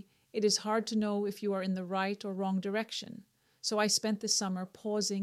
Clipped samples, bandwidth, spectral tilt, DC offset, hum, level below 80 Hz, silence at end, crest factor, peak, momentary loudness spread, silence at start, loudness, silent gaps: under 0.1%; 14.5 kHz; -3.5 dB/octave; under 0.1%; none; -78 dBFS; 0 s; 18 dB; -14 dBFS; 10 LU; 0.35 s; -32 LUFS; none